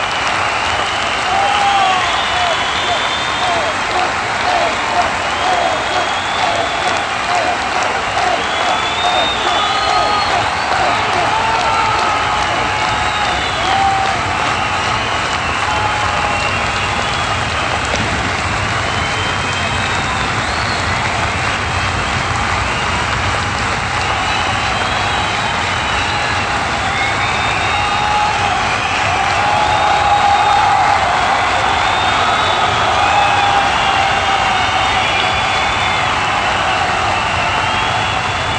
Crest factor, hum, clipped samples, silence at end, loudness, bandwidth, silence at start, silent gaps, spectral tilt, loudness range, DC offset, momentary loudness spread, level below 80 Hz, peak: 16 dB; none; under 0.1%; 0 s; -14 LUFS; 11 kHz; 0 s; none; -3 dB/octave; 3 LU; under 0.1%; 4 LU; -34 dBFS; 0 dBFS